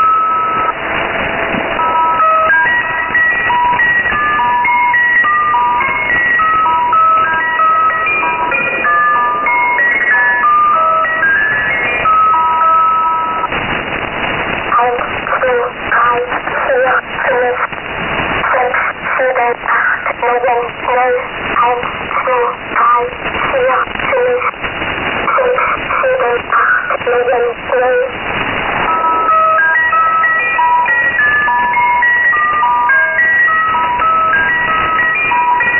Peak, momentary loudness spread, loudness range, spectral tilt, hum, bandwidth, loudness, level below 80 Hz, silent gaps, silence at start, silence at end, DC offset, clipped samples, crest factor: -2 dBFS; 6 LU; 4 LU; 3 dB/octave; none; 3.1 kHz; -11 LUFS; -40 dBFS; none; 0 s; 0 s; under 0.1%; under 0.1%; 10 dB